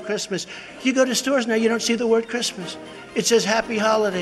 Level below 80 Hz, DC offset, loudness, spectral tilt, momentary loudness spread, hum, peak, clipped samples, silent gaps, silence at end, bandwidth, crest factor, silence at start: -60 dBFS; under 0.1%; -21 LUFS; -3 dB/octave; 11 LU; none; -6 dBFS; under 0.1%; none; 0 s; 14 kHz; 16 dB; 0 s